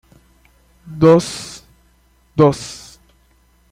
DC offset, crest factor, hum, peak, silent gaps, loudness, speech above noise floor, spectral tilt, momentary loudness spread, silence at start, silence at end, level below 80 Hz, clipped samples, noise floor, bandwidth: under 0.1%; 18 dB; 60 Hz at -45 dBFS; 0 dBFS; none; -15 LUFS; 41 dB; -6.5 dB/octave; 24 LU; 0.9 s; 0.95 s; -48 dBFS; under 0.1%; -55 dBFS; 15 kHz